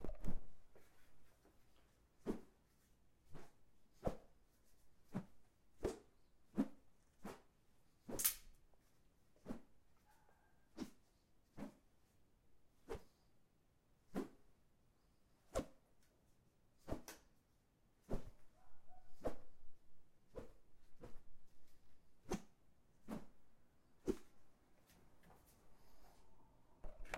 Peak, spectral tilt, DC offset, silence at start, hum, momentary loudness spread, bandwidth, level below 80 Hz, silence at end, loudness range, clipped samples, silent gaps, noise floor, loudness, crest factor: -16 dBFS; -4 dB/octave; under 0.1%; 0 s; none; 19 LU; 16 kHz; -60 dBFS; 0 s; 13 LU; under 0.1%; none; -76 dBFS; -50 LUFS; 34 dB